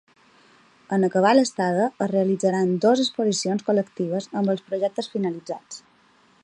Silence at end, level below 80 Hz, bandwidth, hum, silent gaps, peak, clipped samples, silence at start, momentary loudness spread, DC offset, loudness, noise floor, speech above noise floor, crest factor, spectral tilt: 0.65 s; -72 dBFS; 11 kHz; none; none; -6 dBFS; under 0.1%; 0.9 s; 9 LU; under 0.1%; -23 LUFS; -58 dBFS; 36 dB; 18 dB; -5.5 dB/octave